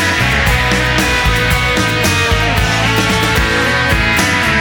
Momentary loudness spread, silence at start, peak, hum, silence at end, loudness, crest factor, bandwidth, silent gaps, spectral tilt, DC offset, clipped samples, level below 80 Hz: 1 LU; 0 s; 0 dBFS; none; 0 s; -12 LUFS; 12 dB; over 20 kHz; none; -4 dB/octave; under 0.1%; under 0.1%; -22 dBFS